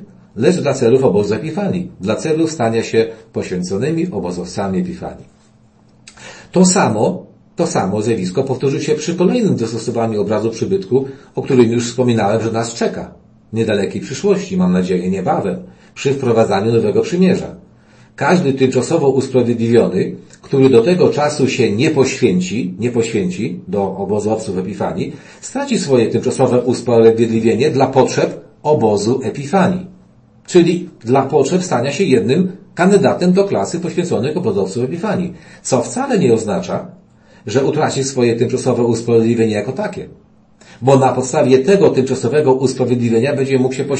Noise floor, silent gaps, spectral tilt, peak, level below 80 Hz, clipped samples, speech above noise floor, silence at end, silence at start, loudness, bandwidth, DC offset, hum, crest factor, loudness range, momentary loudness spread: -49 dBFS; none; -6 dB/octave; 0 dBFS; -52 dBFS; under 0.1%; 34 dB; 0 s; 0 s; -15 LUFS; 8.8 kHz; under 0.1%; none; 16 dB; 5 LU; 10 LU